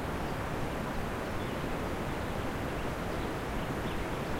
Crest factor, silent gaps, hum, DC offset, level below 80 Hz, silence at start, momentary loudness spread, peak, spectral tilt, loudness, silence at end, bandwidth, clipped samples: 12 dB; none; none; under 0.1%; -42 dBFS; 0 s; 1 LU; -22 dBFS; -6 dB/octave; -36 LUFS; 0 s; 16 kHz; under 0.1%